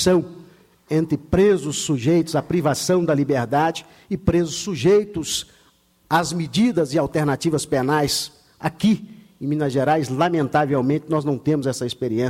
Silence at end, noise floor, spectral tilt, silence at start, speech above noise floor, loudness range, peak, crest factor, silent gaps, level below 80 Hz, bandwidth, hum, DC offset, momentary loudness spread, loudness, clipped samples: 0 s; -58 dBFS; -5.5 dB/octave; 0 s; 38 dB; 2 LU; -4 dBFS; 16 dB; none; -46 dBFS; 16.5 kHz; none; under 0.1%; 7 LU; -21 LUFS; under 0.1%